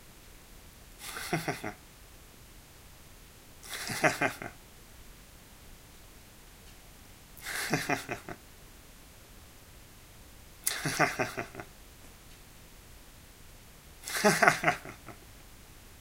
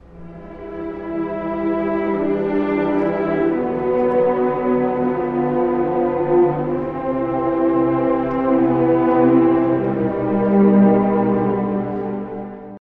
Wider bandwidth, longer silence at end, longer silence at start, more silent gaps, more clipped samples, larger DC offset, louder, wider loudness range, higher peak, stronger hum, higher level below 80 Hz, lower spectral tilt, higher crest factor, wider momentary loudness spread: first, 16 kHz vs 4.4 kHz; about the same, 0 s vs 0.1 s; second, 0 s vs 0.15 s; neither; neither; neither; second, -31 LUFS vs -18 LUFS; first, 10 LU vs 4 LU; about the same, -2 dBFS vs -4 dBFS; neither; second, -56 dBFS vs -46 dBFS; second, -3 dB/octave vs -11 dB/octave; first, 34 dB vs 14 dB; first, 24 LU vs 12 LU